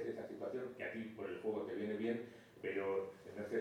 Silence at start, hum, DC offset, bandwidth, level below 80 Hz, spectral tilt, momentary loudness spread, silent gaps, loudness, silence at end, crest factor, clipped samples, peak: 0 s; none; under 0.1%; 16 kHz; -82 dBFS; -7 dB/octave; 8 LU; none; -44 LUFS; 0 s; 14 dB; under 0.1%; -28 dBFS